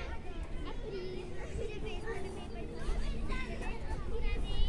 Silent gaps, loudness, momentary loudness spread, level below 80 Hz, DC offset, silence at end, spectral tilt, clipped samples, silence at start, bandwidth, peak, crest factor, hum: none; -42 LUFS; 5 LU; -38 dBFS; under 0.1%; 0 s; -6 dB/octave; under 0.1%; 0 s; 11 kHz; -18 dBFS; 18 dB; none